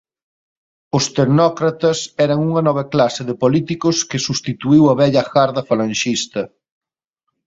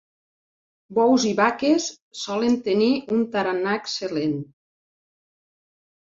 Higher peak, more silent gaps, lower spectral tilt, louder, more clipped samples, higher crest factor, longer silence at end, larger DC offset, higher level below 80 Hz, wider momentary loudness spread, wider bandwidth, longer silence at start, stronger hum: about the same, -2 dBFS vs -4 dBFS; second, none vs 2.02-2.11 s; about the same, -5.5 dB/octave vs -4.5 dB/octave; first, -16 LUFS vs -22 LUFS; neither; about the same, 16 dB vs 20 dB; second, 1 s vs 1.6 s; neither; first, -54 dBFS vs -66 dBFS; about the same, 8 LU vs 10 LU; about the same, 8 kHz vs 7.8 kHz; about the same, 0.95 s vs 0.9 s; neither